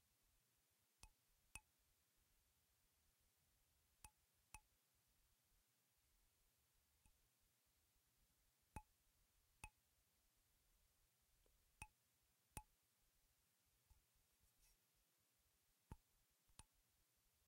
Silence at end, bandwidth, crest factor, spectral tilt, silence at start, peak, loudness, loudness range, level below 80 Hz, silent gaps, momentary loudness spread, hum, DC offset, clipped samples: 0 s; 16 kHz; 38 dB; -3 dB/octave; 0 s; -34 dBFS; -65 LUFS; 0 LU; -78 dBFS; none; 6 LU; none; under 0.1%; under 0.1%